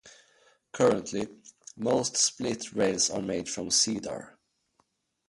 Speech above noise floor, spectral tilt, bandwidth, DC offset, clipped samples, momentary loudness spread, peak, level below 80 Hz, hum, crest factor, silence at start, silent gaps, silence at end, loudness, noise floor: 44 dB; -2.5 dB/octave; 11.5 kHz; under 0.1%; under 0.1%; 15 LU; -10 dBFS; -64 dBFS; none; 20 dB; 0.05 s; none; 1 s; -27 LUFS; -73 dBFS